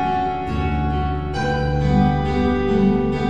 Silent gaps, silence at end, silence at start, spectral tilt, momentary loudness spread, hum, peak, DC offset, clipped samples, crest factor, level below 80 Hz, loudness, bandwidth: none; 0 s; 0 s; -8 dB/octave; 6 LU; none; -4 dBFS; 2%; under 0.1%; 16 dB; -28 dBFS; -20 LUFS; 8.4 kHz